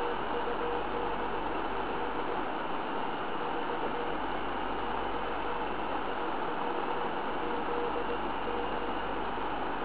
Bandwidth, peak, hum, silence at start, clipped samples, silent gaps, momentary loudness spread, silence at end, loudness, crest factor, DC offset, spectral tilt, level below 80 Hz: 4 kHz; -18 dBFS; none; 0 s; under 0.1%; none; 1 LU; 0 s; -34 LUFS; 14 dB; 1%; -2.5 dB/octave; -52 dBFS